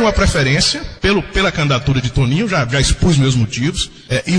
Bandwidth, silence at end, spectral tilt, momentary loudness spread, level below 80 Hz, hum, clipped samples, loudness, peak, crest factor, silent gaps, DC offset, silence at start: 10.5 kHz; 0 s; -4.5 dB/octave; 5 LU; -26 dBFS; none; under 0.1%; -15 LUFS; -2 dBFS; 12 dB; none; under 0.1%; 0 s